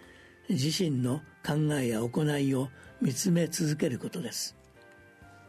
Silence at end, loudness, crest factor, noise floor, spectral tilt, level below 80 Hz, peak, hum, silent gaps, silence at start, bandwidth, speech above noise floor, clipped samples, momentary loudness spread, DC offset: 0.15 s; -30 LUFS; 14 dB; -55 dBFS; -5.5 dB/octave; -64 dBFS; -16 dBFS; none; none; 0 s; 13.5 kHz; 26 dB; under 0.1%; 8 LU; under 0.1%